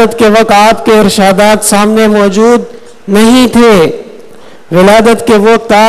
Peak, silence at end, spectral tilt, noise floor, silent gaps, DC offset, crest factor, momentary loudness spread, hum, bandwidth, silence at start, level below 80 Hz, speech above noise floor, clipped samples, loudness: 0 dBFS; 0 s; -4.5 dB/octave; -34 dBFS; none; under 0.1%; 6 dB; 7 LU; none; 15.5 kHz; 0 s; -36 dBFS; 29 dB; 4%; -5 LUFS